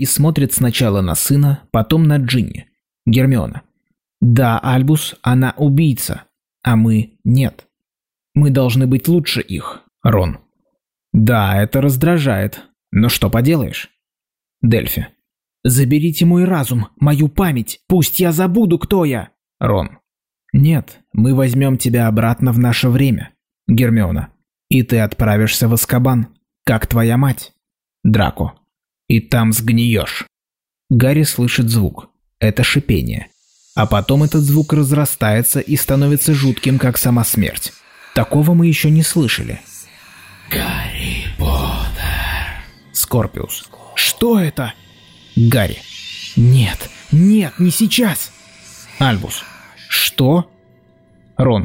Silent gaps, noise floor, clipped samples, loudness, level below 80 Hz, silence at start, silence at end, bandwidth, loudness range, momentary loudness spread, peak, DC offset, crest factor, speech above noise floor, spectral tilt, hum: none; -90 dBFS; under 0.1%; -15 LUFS; -34 dBFS; 0 s; 0 s; 16.5 kHz; 3 LU; 12 LU; -2 dBFS; under 0.1%; 12 dB; 76 dB; -5.5 dB/octave; none